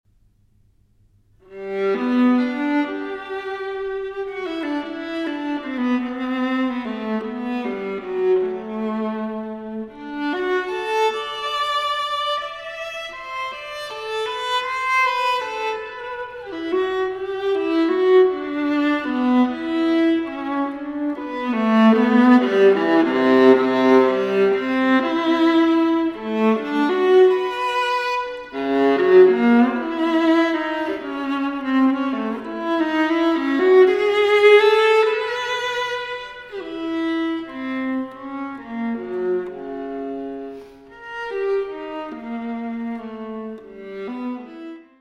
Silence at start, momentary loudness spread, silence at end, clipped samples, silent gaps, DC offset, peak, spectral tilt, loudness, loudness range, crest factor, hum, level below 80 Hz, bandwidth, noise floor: 1.5 s; 16 LU; 0.2 s; under 0.1%; none; under 0.1%; -2 dBFS; -5.5 dB/octave; -20 LUFS; 11 LU; 18 dB; none; -60 dBFS; 11 kHz; -58 dBFS